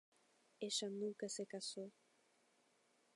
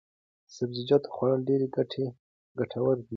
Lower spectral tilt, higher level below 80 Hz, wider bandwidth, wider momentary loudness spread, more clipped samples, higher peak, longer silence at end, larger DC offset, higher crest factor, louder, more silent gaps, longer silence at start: second, -3 dB/octave vs -7.5 dB/octave; second, under -90 dBFS vs -68 dBFS; first, 11.5 kHz vs 7.4 kHz; about the same, 10 LU vs 10 LU; neither; second, -28 dBFS vs -10 dBFS; first, 1.25 s vs 0 s; neither; about the same, 22 dB vs 20 dB; second, -46 LUFS vs -29 LUFS; second, none vs 2.19-2.55 s; about the same, 0.6 s vs 0.5 s